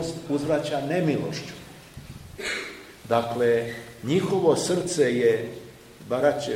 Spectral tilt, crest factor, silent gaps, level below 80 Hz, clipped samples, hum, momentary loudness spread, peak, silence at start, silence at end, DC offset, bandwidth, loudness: -5 dB/octave; 18 dB; none; -56 dBFS; under 0.1%; none; 21 LU; -8 dBFS; 0 s; 0 s; under 0.1%; 16.5 kHz; -25 LUFS